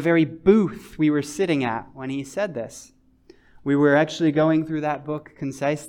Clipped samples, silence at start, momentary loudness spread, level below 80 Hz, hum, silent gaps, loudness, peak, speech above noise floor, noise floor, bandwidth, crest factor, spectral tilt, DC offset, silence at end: under 0.1%; 0 s; 14 LU; -54 dBFS; none; none; -22 LUFS; -4 dBFS; 32 dB; -54 dBFS; 12.5 kHz; 18 dB; -6.5 dB/octave; under 0.1%; 0 s